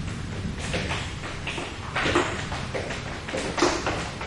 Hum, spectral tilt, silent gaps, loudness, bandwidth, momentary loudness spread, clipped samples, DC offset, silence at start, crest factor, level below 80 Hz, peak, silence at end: none; -4 dB/octave; none; -28 LUFS; 11.5 kHz; 9 LU; under 0.1%; under 0.1%; 0 s; 22 dB; -42 dBFS; -8 dBFS; 0 s